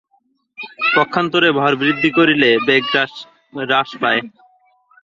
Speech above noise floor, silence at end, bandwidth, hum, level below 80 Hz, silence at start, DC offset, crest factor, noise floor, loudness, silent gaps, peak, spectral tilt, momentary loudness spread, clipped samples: 46 dB; 0.75 s; 7.4 kHz; none; -60 dBFS; 0.6 s; under 0.1%; 16 dB; -62 dBFS; -15 LUFS; none; 0 dBFS; -6 dB/octave; 16 LU; under 0.1%